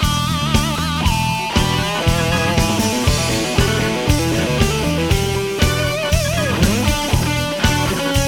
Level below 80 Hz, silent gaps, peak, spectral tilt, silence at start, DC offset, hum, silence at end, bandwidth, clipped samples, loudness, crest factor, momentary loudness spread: -26 dBFS; none; 0 dBFS; -4.5 dB/octave; 0 s; under 0.1%; none; 0 s; 19 kHz; under 0.1%; -17 LUFS; 16 dB; 2 LU